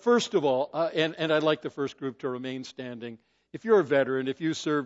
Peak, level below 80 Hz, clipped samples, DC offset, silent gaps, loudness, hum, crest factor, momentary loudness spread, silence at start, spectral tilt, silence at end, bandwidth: -10 dBFS; -78 dBFS; under 0.1%; under 0.1%; none; -27 LUFS; none; 18 dB; 15 LU; 0.05 s; -5 dB/octave; 0 s; 8 kHz